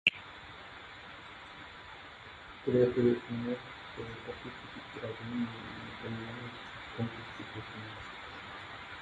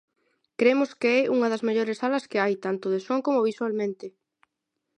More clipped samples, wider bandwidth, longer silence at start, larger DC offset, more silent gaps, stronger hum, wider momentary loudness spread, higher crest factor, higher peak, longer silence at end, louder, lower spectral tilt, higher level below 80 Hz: neither; about the same, 9.2 kHz vs 10 kHz; second, 0.05 s vs 0.6 s; neither; neither; neither; first, 17 LU vs 8 LU; first, 28 dB vs 18 dB; about the same, -10 dBFS vs -8 dBFS; second, 0 s vs 0.9 s; second, -38 LUFS vs -25 LUFS; about the same, -6.5 dB/octave vs -5.5 dB/octave; first, -62 dBFS vs -80 dBFS